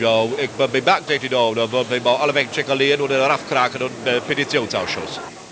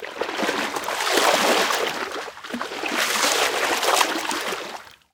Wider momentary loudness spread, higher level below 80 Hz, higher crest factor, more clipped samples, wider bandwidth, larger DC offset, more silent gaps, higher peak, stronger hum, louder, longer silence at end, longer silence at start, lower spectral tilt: second, 6 LU vs 13 LU; first, -58 dBFS vs -64 dBFS; about the same, 18 dB vs 22 dB; neither; second, 8 kHz vs 18 kHz; neither; neither; about the same, -2 dBFS vs 0 dBFS; neither; about the same, -19 LUFS vs -21 LUFS; second, 0 s vs 0.25 s; about the same, 0 s vs 0 s; first, -4 dB/octave vs -0.5 dB/octave